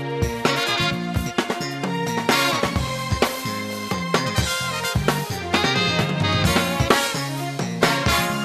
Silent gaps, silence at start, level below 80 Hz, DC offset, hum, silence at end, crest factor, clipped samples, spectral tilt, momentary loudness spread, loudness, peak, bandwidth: none; 0 s; -38 dBFS; under 0.1%; none; 0 s; 20 dB; under 0.1%; -4 dB/octave; 7 LU; -21 LUFS; -2 dBFS; 14 kHz